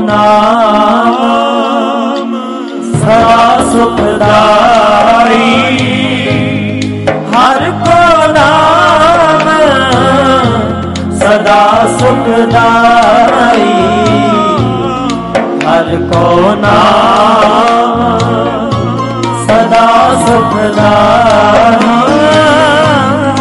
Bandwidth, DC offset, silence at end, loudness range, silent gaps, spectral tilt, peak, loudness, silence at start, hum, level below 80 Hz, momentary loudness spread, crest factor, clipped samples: 11.5 kHz; under 0.1%; 0 s; 3 LU; none; -5.5 dB/octave; 0 dBFS; -7 LUFS; 0 s; none; -34 dBFS; 7 LU; 6 dB; 0.3%